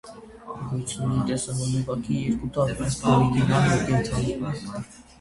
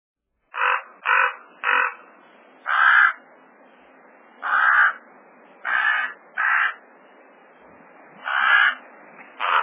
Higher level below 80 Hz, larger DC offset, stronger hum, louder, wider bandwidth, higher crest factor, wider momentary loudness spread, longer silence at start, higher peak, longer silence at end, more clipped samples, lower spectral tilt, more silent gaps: first, -44 dBFS vs -86 dBFS; neither; neither; second, -25 LUFS vs -19 LUFS; first, 11.5 kHz vs 3.8 kHz; about the same, 20 dB vs 18 dB; about the same, 16 LU vs 17 LU; second, 0.05 s vs 0.55 s; about the same, -6 dBFS vs -4 dBFS; first, 0.2 s vs 0 s; neither; first, -6 dB/octave vs -2.5 dB/octave; neither